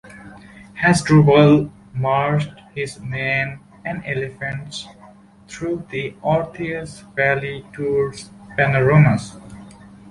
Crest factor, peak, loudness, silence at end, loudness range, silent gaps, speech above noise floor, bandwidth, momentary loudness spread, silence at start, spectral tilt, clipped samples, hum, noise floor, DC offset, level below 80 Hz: 18 dB; -2 dBFS; -19 LUFS; 0 s; 9 LU; none; 28 dB; 11.5 kHz; 19 LU; 0.05 s; -6.5 dB/octave; under 0.1%; none; -46 dBFS; under 0.1%; -48 dBFS